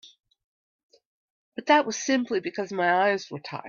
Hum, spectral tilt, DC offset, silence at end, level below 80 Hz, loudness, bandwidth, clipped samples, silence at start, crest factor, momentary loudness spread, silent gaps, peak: none; -3.5 dB/octave; under 0.1%; 0 s; -76 dBFS; -25 LUFS; 7.4 kHz; under 0.1%; 0.05 s; 22 dB; 14 LU; 0.44-0.89 s, 1.05-1.52 s; -6 dBFS